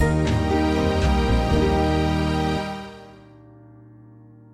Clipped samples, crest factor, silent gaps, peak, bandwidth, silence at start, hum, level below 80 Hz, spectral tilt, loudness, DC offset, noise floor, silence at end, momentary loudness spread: under 0.1%; 14 dB; none; -8 dBFS; 13.5 kHz; 0 s; none; -28 dBFS; -6.5 dB/octave; -21 LUFS; under 0.1%; -47 dBFS; 1.4 s; 12 LU